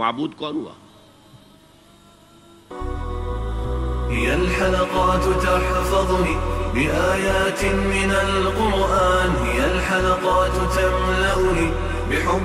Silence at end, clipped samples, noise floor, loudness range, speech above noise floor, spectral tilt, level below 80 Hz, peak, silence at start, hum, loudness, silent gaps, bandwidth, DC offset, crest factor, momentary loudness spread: 0 s; under 0.1%; -50 dBFS; 12 LU; 31 dB; -5 dB/octave; -28 dBFS; -6 dBFS; 0 s; none; -20 LUFS; none; 15.5 kHz; under 0.1%; 14 dB; 10 LU